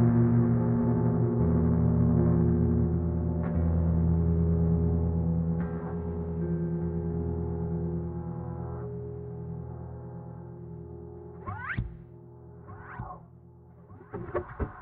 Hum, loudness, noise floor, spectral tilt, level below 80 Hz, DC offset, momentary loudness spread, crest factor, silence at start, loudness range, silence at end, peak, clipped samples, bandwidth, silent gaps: none; -28 LUFS; -52 dBFS; -11.5 dB/octave; -42 dBFS; under 0.1%; 19 LU; 14 dB; 0 s; 15 LU; 0 s; -14 dBFS; under 0.1%; 3 kHz; none